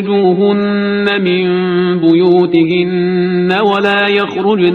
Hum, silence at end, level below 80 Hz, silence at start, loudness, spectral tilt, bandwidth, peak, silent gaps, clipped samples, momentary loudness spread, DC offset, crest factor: none; 0 s; -54 dBFS; 0 s; -12 LUFS; -8 dB/octave; 6.2 kHz; 0 dBFS; none; under 0.1%; 4 LU; under 0.1%; 10 dB